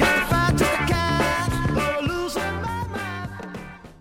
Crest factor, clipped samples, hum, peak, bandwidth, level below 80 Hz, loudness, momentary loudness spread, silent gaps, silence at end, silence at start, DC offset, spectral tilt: 16 dB; under 0.1%; none; -8 dBFS; 16.5 kHz; -36 dBFS; -23 LUFS; 15 LU; none; 0.05 s; 0 s; under 0.1%; -5 dB/octave